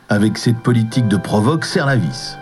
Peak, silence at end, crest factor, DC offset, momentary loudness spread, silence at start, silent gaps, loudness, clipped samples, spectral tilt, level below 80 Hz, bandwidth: -2 dBFS; 0 s; 14 dB; under 0.1%; 2 LU; 0.1 s; none; -16 LUFS; under 0.1%; -6 dB/octave; -46 dBFS; 12.5 kHz